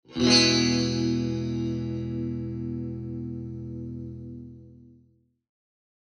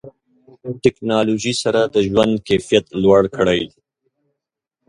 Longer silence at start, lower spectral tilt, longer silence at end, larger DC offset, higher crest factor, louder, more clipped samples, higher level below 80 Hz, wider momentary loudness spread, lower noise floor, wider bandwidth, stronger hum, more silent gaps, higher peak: about the same, 0.1 s vs 0.05 s; about the same, -4 dB/octave vs -5 dB/octave; about the same, 1.15 s vs 1.2 s; neither; first, 24 dB vs 18 dB; second, -26 LUFS vs -17 LUFS; neither; about the same, -50 dBFS vs -48 dBFS; first, 20 LU vs 7 LU; second, -63 dBFS vs -81 dBFS; about the same, 10.5 kHz vs 11.5 kHz; neither; neither; second, -4 dBFS vs 0 dBFS